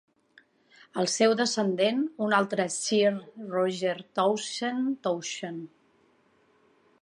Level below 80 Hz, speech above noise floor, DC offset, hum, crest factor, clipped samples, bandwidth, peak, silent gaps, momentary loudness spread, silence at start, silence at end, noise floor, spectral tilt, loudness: -82 dBFS; 38 dB; under 0.1%; none; 20 dB; under 0.1%; 11.5 kHz; -10 dBFS; none; 12 LU; 0.95 s; 1.35 s; -65 dBFS; -3.5 dB/octave; -27 LUFS